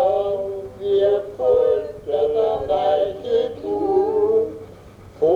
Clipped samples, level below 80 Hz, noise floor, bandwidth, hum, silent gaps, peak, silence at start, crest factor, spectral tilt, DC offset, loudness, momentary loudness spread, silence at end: under 0.1%; -50 dBFS; -42 dBFS; 7 kHz; none; none; -8 dBFS; 0 s; 12 dB; -7 dB/octave; under 0.1%; -20 LUFS; 8 LU; 0 s